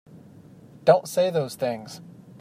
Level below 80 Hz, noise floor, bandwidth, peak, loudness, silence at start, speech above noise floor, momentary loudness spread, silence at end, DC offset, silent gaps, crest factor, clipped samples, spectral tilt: -72 dBFS; -48 dBFS; 15.5 kHz; -4 dBFS; -23 LUFS; 0.85 s; 26 dB; 19 LU; 0.4 s; under 0.1%; none; 22 dB; under 0.1%; -5.5 dB/octave